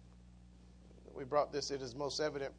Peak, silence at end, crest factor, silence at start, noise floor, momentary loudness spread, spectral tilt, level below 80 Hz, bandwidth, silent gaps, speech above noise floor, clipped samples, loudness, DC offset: -20 dBFS; 0 s; 20 dB; 0 s; -59 dBFS; 21 LU; -4 dB/octave; -62 dBFS; 10.5 kHz; none; 21 dB; under 0.1%; -38 LUFS; under 0.1%